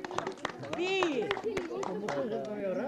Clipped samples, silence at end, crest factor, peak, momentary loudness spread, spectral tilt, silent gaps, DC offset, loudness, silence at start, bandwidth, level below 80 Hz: under 0.1%; 0 s; 22 dB; -12 dBFS; 8 LU; -4.5 dB/octave; none; under 0.1%; -34 LUFS; 0 s; 13 kHz; -66 dBFS